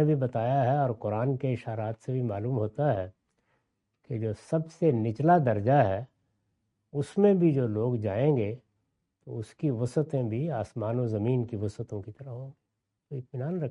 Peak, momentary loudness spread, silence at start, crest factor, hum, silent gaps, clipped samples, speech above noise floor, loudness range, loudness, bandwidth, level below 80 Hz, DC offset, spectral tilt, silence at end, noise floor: -10 dBFS; 16 LU; 0 s; 18 dB; none; none; under 0.1%; 50 dB; 6 LU; -28 LUFS; 11 kHz; -66 dBFS; under 0.1%; -9.5 dB/octave; 0 s; -78 dBFS